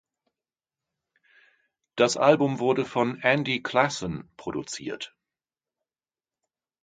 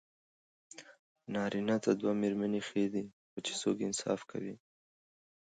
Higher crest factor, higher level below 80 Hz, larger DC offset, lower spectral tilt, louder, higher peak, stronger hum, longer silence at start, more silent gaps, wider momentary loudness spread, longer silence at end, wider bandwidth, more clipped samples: about the same, 26 dB vs 22 dB; first, -62 dBFS vs -78 dBFS; neither; about the same, -4.5 dB/octave vs -4.5 dB/octave; first, -25 LUFS vs -35 LUFS; first, -2 dBFS vs -16 dBFS; neither; first, 1.95 s vs 0.75 s; second, none vs 0.99-1.15 s, 3.13-3.37 s; second, 15 LU vs 21 LU; first, 1.75 s vs 1 s; about the same, 9.6 kHz vs 9.4 kHz; neither